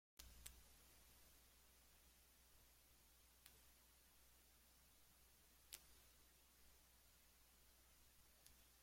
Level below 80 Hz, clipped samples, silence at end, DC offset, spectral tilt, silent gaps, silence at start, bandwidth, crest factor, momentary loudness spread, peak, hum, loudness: -76 dBFS; under 0.1%; 0 s; under 0.1%; -1.5 dB/octave; none; 0.15 s; 16.5 kHz; 38 dB; 8 LU; -32 dBFS; none; -65 LUFS